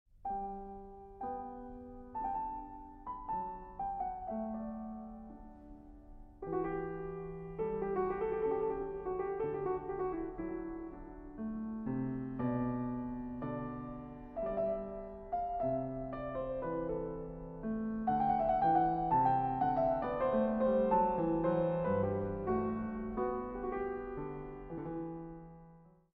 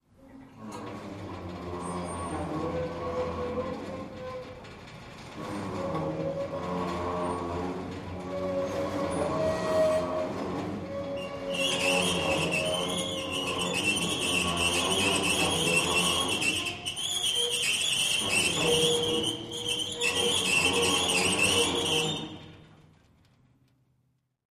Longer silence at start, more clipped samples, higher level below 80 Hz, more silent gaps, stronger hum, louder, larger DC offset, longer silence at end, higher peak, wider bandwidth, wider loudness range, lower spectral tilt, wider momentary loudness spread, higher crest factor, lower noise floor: about the same, 0.15 s vs 0.2 s; neither; about the same, -54 dBFS vs -54 dBFS; neither; neither; second, -37 LUFS vs -27 LUFS; neither; second, 0.3 s vs 1.75 s; second, -18 dBFS vs -12 dBFS; second, 4.9 kHz vs 15.5 kHz; about the same, 11 LU vs 10 LU; first, -8 dB/octave vs -2.5 dB/octave; about the same, 16 LU vs 16 LU; about the same, 18 dB vs 18 dB; second, -60 dBFS vs -73 dBFS